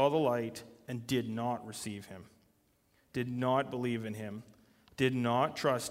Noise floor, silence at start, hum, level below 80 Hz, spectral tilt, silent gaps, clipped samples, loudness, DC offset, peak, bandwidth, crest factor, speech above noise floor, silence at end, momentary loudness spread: -71 dBFS; 0 s; none; -70 dBFS; -5.5 dB/octave; none; under 0.1%; -34 LUFS; under 0.1%; -14 dBFS; 16 kHz; 20 dB; 38 dB; 0 s; 16 LU